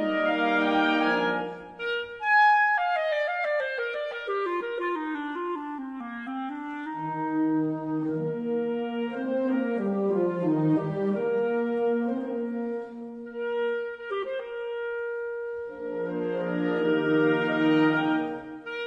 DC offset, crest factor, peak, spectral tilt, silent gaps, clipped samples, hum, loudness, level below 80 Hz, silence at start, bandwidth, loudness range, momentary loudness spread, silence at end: under 0.1%; 16 dB; -12 dBFS; -7.5 dB/octave; none; under 0.1%; none; -27 LUFS; -68 dBFS; 0 s; 7 kHz; 7 LU; 11 LU; 0 s